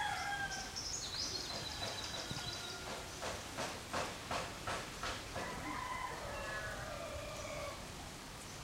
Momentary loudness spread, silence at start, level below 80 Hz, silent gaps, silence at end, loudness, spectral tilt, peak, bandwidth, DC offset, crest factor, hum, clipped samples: 6 LU; 0 s; -58 dBFS; none; 0 s; -42 LUFS; -2.5 dB/octave; -26 dBFS; 16 kHz; under 0.1%; 16 dB; none; under 0.1%